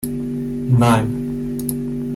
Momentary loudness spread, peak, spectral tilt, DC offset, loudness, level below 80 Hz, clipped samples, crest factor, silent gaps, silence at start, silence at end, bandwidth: 10 LU; -4 dBFS; -7 dB/octave; under 0.1%; -20 LUFS; -40 dBFS; under 0.1%; 14 dB; none; 0 s; 0 s; 16 kHz